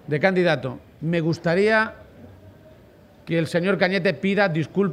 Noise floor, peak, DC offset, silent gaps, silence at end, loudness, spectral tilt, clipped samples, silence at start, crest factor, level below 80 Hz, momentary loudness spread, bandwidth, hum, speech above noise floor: -50 dBFS; -4 dBFS; under 0.1%; none; 0 s; -22 LUFS; -7 dB/octave; under 0.1%; 0.1 s; 18 dB; -58 dBFS; 8 LU; 11.5 kHz; none; 29 dB